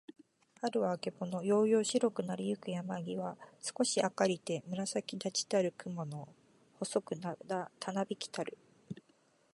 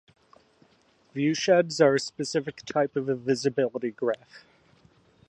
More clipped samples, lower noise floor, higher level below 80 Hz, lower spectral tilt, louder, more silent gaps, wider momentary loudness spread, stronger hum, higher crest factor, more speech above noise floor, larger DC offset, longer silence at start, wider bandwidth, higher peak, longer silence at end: neither; first, -70 dBFS vs -63 dBFS; second, -82 dBFS vs -72 dBFS; about the same, -4.5 dB/octave vs -5 dB/octave; second, -36 LUFS vs -26 LUFS; neither; first, 13 LU vs 9 LU; neither; about the same, 20 dB vs 20 dB; about the same, 35 dB vs 37 dB; neither; second, 0.1 s vs 1.15 s; about the same, 11.5 kHz vs 11 kHz; second, -16 dBFS vs -8 dBFS; second, 0.6 s vs 0.9 s